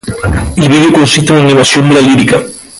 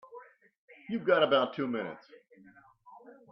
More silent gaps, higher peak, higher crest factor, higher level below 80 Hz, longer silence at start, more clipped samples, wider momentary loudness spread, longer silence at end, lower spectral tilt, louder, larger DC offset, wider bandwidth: second, none vs 0.58-0.68 s; first, 0 dBFS vs -12 dBFS; second, 8 dB vs 20 dB; first, -26 dBFS vs -80 dBFS; about the same, 0.05 s vs 0.1 s; neither; second, 7 LU vs 27 LU; second, 0 s vs 0.2 s; second, -5 dB/octave vs -7.5 dB/octave; first, -7 LUFS vs -29 LUFS; neither; first, 11.5 kHz vs 5.8 kHz